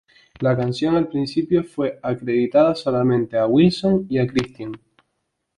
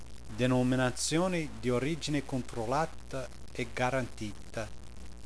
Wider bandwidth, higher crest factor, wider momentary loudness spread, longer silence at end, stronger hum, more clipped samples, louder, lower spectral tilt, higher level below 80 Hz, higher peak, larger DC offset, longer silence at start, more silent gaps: about the same, 11 kHz vs 11 kHz; about the same, 16 dB vs 16 dB; second, 10 LU vs 14 LU; first, 0.8 s vs 0.05 s; neither; neither; first, -20 LUFS vs -33 LUFS; first, -7.5 dB/octave vs -5 dB/octave; about the same, -52 dBFS vs -50 dBFS; first, -4 dBFS vs -16 dBFS; second, under 0.1% vs 0.8%; first, 0.4 s vs 0 s; neither